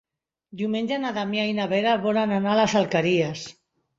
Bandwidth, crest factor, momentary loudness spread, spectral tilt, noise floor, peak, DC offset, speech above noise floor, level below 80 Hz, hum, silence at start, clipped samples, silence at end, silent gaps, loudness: 7.8 kHz; 16 dB; 8 LU; -5.5 dB/octave; -65 dBFS; -8 dBFS; under 0.1%; 42 dB; -64 dBFS; none; 0.55 s; under 0.1%; 0.45 s; none; -23 LUFS